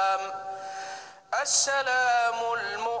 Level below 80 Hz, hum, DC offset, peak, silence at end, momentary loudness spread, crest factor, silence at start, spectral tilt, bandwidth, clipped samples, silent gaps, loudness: -76 dBFS; none; under 0.1%; -12 dBFS; 0 s; 14 LU; 16 dB; 0 s; 1.5 dB/octave; 10 kHz; under 0.1%; none; -26 LUFS